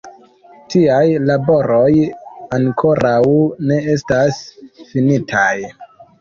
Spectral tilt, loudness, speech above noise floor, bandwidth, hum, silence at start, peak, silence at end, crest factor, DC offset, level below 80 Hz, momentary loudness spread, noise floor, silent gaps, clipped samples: -7 dB/octave; -15 LUFS; 30 dB; 7.4 kHz; none; 0.05 s; -2 dBFS; 0.15 s; 14 dB; under 0.1%; -48 dBFS; 10 LU; -44 dBFS; none; under 0.1%